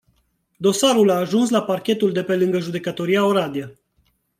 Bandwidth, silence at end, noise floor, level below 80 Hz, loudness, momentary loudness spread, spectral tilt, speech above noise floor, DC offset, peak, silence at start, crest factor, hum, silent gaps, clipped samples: 16 kHz; 0.7 s; -66 dBFS; -66 dBFS; -19 LUFS; 10 LU; -5 dB/octave; 47 dB; under 0.1%; -4 dBFS; 0.6 s; 16 dB; none; none; under 0.1%